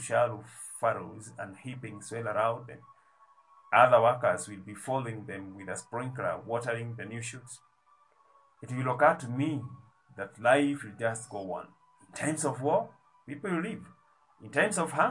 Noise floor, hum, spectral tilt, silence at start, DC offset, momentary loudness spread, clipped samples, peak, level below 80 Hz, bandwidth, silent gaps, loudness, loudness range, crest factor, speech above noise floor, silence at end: -66 dBFS; none; -5 dB/octave; 0 s; under 0.1%; 17 LU; under 0.1%; -8 dBFS; -76 dBFS; 11.5 kHz; none; -30 LUFS; 8 LU; 24 dB; 36 dB; 0 s